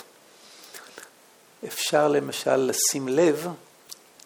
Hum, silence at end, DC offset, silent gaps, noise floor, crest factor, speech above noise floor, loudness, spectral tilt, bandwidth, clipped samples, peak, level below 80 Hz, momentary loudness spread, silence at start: none; 0.35 s; under 0.1%; none; -55 dBFS; 18 dB; 32 dB; -23 LUFS; -3 dB/octave; over 20 kHz; under 0.1%; -8 dBFS; -78 dBFS; 23 LU; 0.6 s